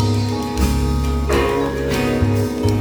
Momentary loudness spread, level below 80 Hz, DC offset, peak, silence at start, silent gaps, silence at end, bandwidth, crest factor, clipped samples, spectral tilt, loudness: 2 LU; -24 dBFS; under 0.1%; -4 dBFS; 0 s; none; 0 s; over 20 kHz; 14 dB; under 0.1%; -6.5 dB/octave; -19 LUFS